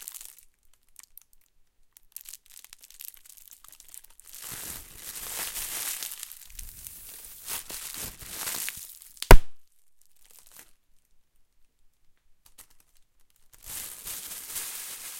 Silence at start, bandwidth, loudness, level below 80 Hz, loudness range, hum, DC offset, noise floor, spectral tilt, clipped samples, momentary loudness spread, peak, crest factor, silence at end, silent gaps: 4.4 s; 17 kHz; -31 LUFS; -32 dBFS; 18 LU; none; under 0.1%; -65 dBFS; -3.5 dB/octave; under 0.1%; 19 LU; 0 dBFS; 28 dB; 0 s; none